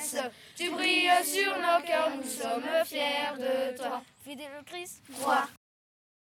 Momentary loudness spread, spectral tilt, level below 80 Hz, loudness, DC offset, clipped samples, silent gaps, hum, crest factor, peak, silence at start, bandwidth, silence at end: 17 LU; -1 dB/octave; -78 dBFS; -29 LUFS; under 0.1%; under 0.1%; none; none; 18 dB; -12 dBFS; 0 s; 18.5 kHz; 0.8 s